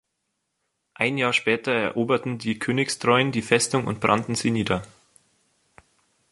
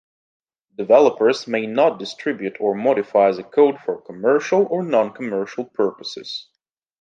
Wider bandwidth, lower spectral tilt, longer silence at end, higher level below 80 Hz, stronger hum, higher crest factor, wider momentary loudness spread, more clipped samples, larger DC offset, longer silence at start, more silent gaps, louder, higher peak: first, 11.5 kHz vs 7.6 kHz; about the same, -4.5 dB/octave vs -5.5 dB/octave; first, 1.45 s vs 0.6 s; first, -58 dBFS vs -72 dBFS; neither; about the same, 22 dB vs 18 dB; second, 6 LU vs 12 LU; neither; neither; first, 1 s vs 0.8 s; neither; second, -23 LUFS vs -19 LUFS; about the same, -4 dBFS vs -2 dBFS